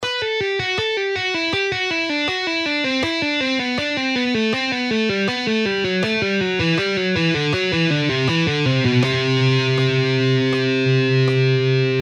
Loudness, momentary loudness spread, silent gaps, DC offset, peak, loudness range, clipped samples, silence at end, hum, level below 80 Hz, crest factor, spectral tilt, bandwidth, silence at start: -19 LUFS; 3 LU; none; under 0.1%; -6 dBFS; 2 LU; under 0.1%; 0 s; none; -52 dBFS; 14 dB; -5.5 dB/octave; 9 kHz; 0 s